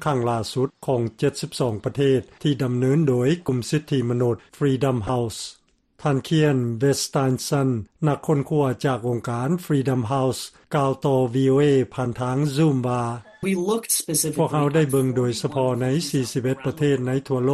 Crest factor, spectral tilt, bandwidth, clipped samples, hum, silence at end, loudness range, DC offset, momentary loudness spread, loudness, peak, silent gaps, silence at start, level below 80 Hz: 14 dB; -6 dB/octave; 13 kHz; under 0.1%; none; 0 s; 2 LU; under 0.1%; 6 LU; -22 LUFS; -8 dBFS; none; 0 s; -54 dBFS